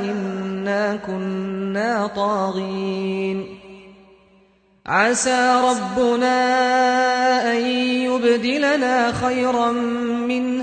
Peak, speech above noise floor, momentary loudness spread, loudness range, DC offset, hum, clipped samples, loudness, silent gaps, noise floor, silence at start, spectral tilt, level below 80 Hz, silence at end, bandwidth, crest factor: -4 dBFS; 37 dB; 9 LU; 7 LU; under 0.1%; none; under 0.1%; -20 LUFS; none; -56 dBFS; 0 s; -4 dB/octave; -56 dBFS; 0 s; 9.4 kHz; 16 dB